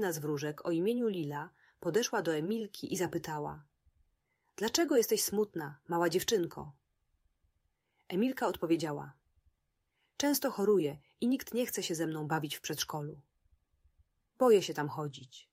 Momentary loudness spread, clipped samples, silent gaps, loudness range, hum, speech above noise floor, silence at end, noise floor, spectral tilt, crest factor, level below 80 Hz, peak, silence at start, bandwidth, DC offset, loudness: 13 LU; under 0.1%; none; 4 LU; none; 48 dB; 0.1 s; -81 dBFS; -4.5 dB/octave; 20 dB; -72 dBFS; -14 dBFS; 0 s; 16 kHz; under 0.1%; -33 LUFS